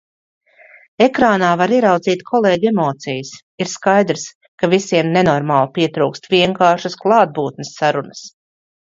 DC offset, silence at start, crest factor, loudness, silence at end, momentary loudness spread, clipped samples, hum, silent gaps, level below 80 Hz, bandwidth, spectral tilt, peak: under 0.1%; 1 s; 16 dB; -16 LUFS; 0.5 s; 11 LU; under 0.1%; none; 3.43-3.58 s, 4.35-4.41 s, 4.48-4.58 s; -56 dBFS; 7.8 kHz; -5 dB/octave; 0 dBFS